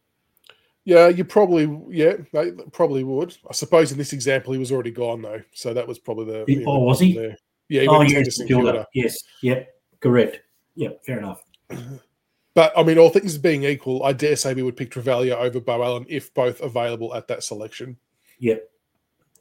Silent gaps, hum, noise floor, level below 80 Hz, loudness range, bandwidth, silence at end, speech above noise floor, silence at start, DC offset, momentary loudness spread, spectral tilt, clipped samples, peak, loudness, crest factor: none; none; -71 dBFS; -58 dBFS; 7 LU; 17 kHz; 0.75 s; 52 dB; 0.85 s; under 0.1%; 16 LU; -5.5 dB/octave; under 0.1%; -2 dBFS; -20 LUFS; 20 dB